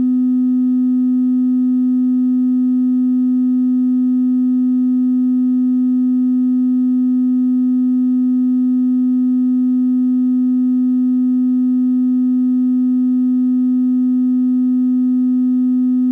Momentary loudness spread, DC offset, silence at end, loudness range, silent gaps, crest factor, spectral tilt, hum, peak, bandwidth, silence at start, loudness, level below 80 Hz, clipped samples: 0 LU; under 0.1%; 0 s; 0 LU; none; 4 dB; -9.5 dB/octave; none; -12 dBFS; 1.9 kHz; 0 s; -15 LUFS; -78 dBFS; under 0.1%